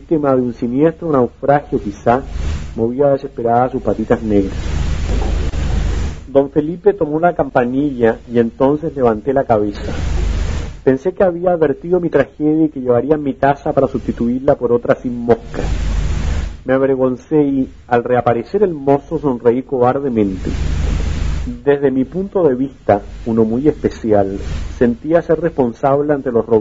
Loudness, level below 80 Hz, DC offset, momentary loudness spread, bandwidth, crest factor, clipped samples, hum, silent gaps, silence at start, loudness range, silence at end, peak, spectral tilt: -16 LUFS; -26 dBFS; under 0.1%; 6 LU; 7.8 kHz; 16 dB; under 0.1%; none; none; 0 s; 2 LU; 0 s; 0 dBFS; -8 dB/octave